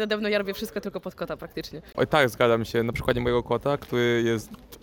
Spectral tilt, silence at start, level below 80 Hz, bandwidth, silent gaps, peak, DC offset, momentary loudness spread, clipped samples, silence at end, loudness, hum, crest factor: -5.5 dB/octave; 0 s; -48 dBFS; 17.5 kHz; none; -8 dBFS; under 0.1%; 13 LU; under 0.1%; 0.05 s; -26 LUFS; none; 18 dB